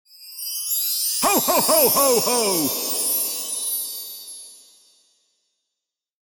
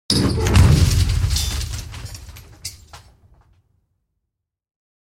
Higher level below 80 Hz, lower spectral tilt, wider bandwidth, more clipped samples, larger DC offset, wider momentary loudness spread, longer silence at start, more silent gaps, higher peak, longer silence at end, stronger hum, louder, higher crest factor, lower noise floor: second, -62 dBFS vs -28 dBFS; second, -1 dB/octave vs -5 dB/octave; first, 19 kHz vs 16.5 kHz; neither; neither; second, 17 LU vs 20 LU; about the same, 0.2 s vs 0.1 s; neither; about the same, -4 dBFS vs -2 dBFS; second, 1.75 s vs 2.1 s; neither; about the same, -19 LUFS vs -17 LUFS; about the same, 18 dB vs 20 dB; first, -84 dBFS vs -80 dBFS